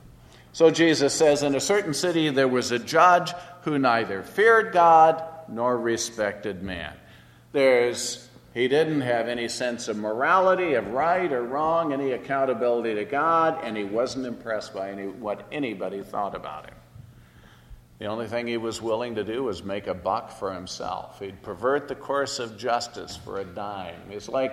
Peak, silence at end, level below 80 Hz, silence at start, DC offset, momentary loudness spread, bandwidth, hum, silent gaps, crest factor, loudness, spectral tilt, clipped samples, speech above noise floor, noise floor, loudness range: -4 dBFS; 0 s; -58 dBFS; 0.05 s; under 0.1%; 15 LU; 14.5 kHz; none; none; 20 dB; -24 LUFS; -4 dB/octave; under 0.1%; 27 dB; -51 dBFS; 11 LU